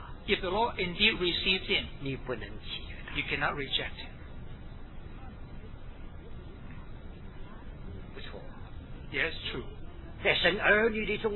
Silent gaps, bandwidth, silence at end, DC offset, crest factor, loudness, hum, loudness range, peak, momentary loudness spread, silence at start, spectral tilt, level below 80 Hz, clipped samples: none; 4.3 kHz; 0 s; under 0.1%; 24 dB; -29 LUFS; none; 18 LU; -10 dBFS; 23 LU; 0 s; -7 dB/octave; -44 dBFS; under 0.1%